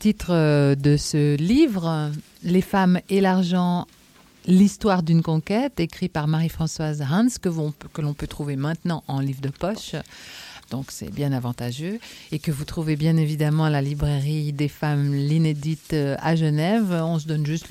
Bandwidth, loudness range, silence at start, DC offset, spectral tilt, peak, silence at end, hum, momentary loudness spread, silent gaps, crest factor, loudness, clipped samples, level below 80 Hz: 15.5 kHz; 8 LU; 0 s; under 0.1%; -7 dB/octave; -8 dBFS; 0 s; none; 12 LU; none; 14 dB; -23 LUFS; under 0.1%; -46 dBFS